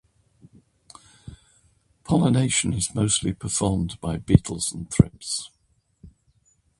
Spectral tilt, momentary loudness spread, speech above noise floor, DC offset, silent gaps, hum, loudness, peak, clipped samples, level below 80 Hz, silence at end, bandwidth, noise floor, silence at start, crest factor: -5 dB/octave; 10 LU; 42 dB; under 0.1%; none; none; -23 LUFS; 0 dBFS; under 0.1%; -42 dBFS; 0.7 s; 11.5 kHz; -64 dBFS; 1.25 s; 26 dB